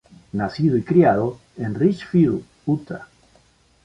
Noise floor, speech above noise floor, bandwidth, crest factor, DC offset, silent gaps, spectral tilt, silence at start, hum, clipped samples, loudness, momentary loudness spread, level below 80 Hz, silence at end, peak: -57 dBFS; 38 dB; 7.8 kHz; 18 dB; under 0.1%; none; -9.5 dB/octave; 0.35 s; none; under 0.1%; -21 LUFS; 15 LU; -52 dBFS; 0.8 s; -2 dBFS